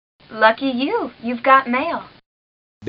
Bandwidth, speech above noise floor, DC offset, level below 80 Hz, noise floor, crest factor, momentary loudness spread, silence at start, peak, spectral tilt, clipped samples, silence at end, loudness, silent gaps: 5.4 kHz; over 72 dB; under 0.1%; -62 dBFS; under -90 dBFS; 20 dB; 12 LU; 0.3 s; 0 dBFS; -1 dB/octave; under 0.1%; 0 s; -18 LUFS; 2.26-2.81 s